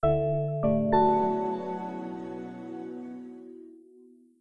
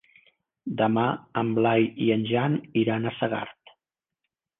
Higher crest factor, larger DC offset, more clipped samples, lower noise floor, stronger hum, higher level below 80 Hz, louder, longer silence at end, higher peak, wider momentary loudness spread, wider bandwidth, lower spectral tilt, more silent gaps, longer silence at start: about the same, 18 dB vs 18 dB; neither; neither; second, -56 dBFS vs -86 dBFS; neither; first, -52 dBFS vs -66 dBFS; second, -28 LUFS vs -25 LUFS; second, 0.65 s vs 1.1 s; about the same, -10 dBFS vs -10 dBFS; first, 21 LU vs 10 LU; first, 6.6 kHz vs 3.9 kHz; about the same, -10 dB/octave vs -10 dB/octave; neither; second, 0 s vs 0.65 s